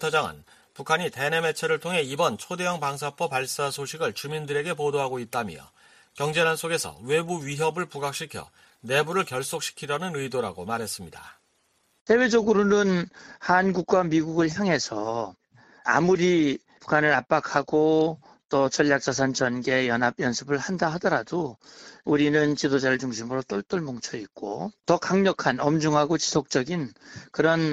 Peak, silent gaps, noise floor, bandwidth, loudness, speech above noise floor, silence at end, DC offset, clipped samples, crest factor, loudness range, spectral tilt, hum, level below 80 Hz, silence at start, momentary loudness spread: -6 dBFS; 12.01-12.06 s, 18.45-18.49 s; -68 dBFS; 14.5 kHz; -25 LUFS; 43 dB; 0 s; under 0.1%; under 0.1%; 20 dB; 5 LU; -4.5 dB/octave; none; -62 dBFS; 0 s; 12 LU